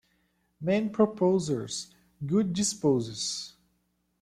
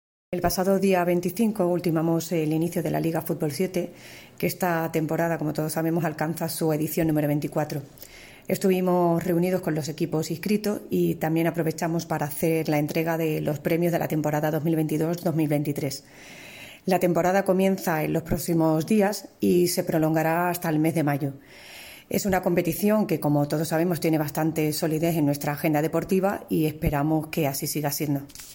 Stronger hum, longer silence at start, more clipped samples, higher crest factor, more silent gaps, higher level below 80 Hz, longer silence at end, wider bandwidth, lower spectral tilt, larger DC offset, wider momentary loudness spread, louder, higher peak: neither; first, 0.6 s vs 0.3 s; neither; about the same, 20 dB vs 16 dB; neither; second, -66 dBFS vs -50 dBFS; first, 0.7 s vs 0 s; second, 14 kHz vs 17 kHz; about the same, -5 dB/octave vs -6 dB/octave; neither; first, 12 LU vs 8 LU; second, -28 LUFS vs -25 LUFS; about the same, -10 dBFS vs -8 dBFS